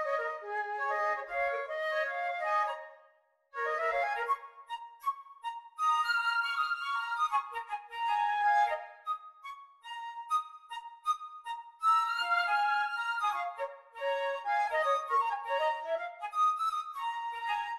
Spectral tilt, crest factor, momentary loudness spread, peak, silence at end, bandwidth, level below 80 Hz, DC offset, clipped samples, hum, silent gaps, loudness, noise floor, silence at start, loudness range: 1 dB/octave; 14 dB; 14 LU; -18 dBFS; 0 s; 15 kHz; -76 dBFS; under 0.1%; under 0.1%; none; none; -32 LUFS; -67 dBFS; 0 s; 3 LU